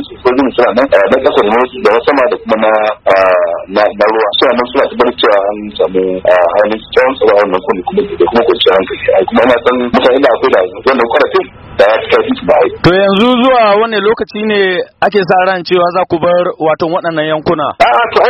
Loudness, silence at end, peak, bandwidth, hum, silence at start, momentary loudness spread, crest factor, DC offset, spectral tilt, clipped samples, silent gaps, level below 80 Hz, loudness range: -10 LUFS; 0 s; 0 dBFS; 8.6 kHz; none; 0 s; 5 LU; 10 dB; under 0.1%; -6.5 dB/octave; 0.5%; none; -40 dBFS; 2 LU